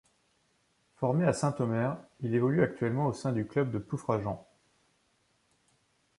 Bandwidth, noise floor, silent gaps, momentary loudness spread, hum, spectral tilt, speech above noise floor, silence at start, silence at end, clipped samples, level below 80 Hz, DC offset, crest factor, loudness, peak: 11.5 kHz; -72 dBFS; none; 7 LU; none; -7.5 dB/octave; 42 dB; 1 s; 1.75 s; under 0.1%; -62 dBFS; under 0.1%; 20 dB; -31 LUFS; -12 dBFS